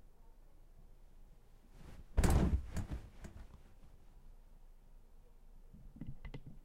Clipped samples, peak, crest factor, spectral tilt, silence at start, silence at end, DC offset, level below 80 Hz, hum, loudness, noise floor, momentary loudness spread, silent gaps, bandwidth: under 0.1%; -18 dBFS; 24 dB; -6.5 dB/octave; 0.05 s; 0 s; under 0.1%; -44 dBFS; none; -39 LUFS; -59 dBFS; 28 LU; none; 16 kHz